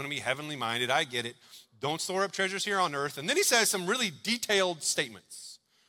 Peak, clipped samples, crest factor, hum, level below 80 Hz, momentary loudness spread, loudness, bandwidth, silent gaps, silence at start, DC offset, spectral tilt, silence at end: -10 dBFS; under 0.1%; 20 dB; none; -76 dBFS; 12 LU; -29 LUFS; 17.5 kHz; none; 0 s; under 0.1%; -2 dB/octave; 0.35 s